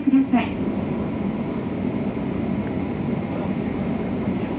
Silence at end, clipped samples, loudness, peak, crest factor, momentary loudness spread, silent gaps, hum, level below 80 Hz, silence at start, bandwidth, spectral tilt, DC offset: 0 s; under 0.1%; -24 LUFS; -8 dBFS; 14 dB; 4 LU; none; none; -44 dBFS; 0 s; 4.5 kHz; -12 dB/octave; under 0.1%